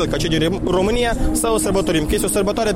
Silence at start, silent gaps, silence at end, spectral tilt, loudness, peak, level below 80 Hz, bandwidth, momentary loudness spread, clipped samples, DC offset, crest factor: 0 s; none; 0 s; -4.5 dB/octave; -18 LUFS; -8 dBFS; -28 dBFS; 16.5 kHz; 1 LU; under 0.1%; under 0.1%; 10 dB